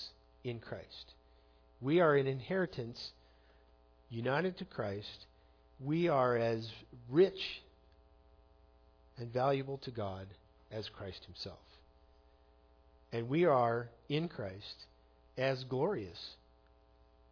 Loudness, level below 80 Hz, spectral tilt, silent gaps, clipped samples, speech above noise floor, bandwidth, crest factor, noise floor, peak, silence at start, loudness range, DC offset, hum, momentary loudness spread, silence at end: -36 LUFS; -66 dBFS; -5 dB/octave; none; under 0.1%; 31 dB; 5.4 kHz; 20 dB; -66 dBFS; -18 dBFS; 0 s; 6 LU; under 0.1%; none; 19 LU; 0.95 s